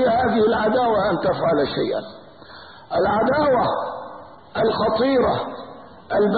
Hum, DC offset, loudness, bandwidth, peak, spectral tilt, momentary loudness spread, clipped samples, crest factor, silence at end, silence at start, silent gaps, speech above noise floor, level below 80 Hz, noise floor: none; 0.2%; -20 LUFS; 4.8 kHz; -8 dBFS; -11 dB/octave; 20 LU; under 0.1%; 12 dB; 0 s; 0 s; none; 23 dB; -48 dBFS; -42 dBFS